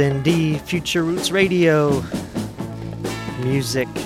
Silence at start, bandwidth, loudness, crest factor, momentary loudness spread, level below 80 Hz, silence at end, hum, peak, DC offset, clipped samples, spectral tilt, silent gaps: 0 s; 16 kHz; -20 LUFS; 16 dB; 13 LU; -44 dBFS; 0 s; none; -4 dBFS; under 0.1%; under 0.1%; -5.5 dB/octave; none